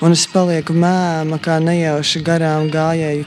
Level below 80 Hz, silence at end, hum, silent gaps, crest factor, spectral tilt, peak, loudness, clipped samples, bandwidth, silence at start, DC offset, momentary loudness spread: -54 dBFS; 0 s; none; none; 14 dB; -5 dB/octave; 0 dBFS; -16 LUFS; under 0.1%; 11.5 kHz; 0 s; under 0.1%; 3 LU